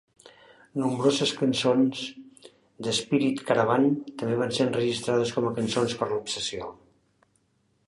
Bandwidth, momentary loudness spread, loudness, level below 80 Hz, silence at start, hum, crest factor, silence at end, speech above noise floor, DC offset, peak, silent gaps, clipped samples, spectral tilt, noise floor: 11.5 kHz; 10 LU; -26 LUFS; -64 dBFS; 0.25 s; none; 20 dB; 1.15 s; 44 dB; under 0.1%; -8 dBFS; none; under 0.1%; -5 dB/octave; -69 dBFS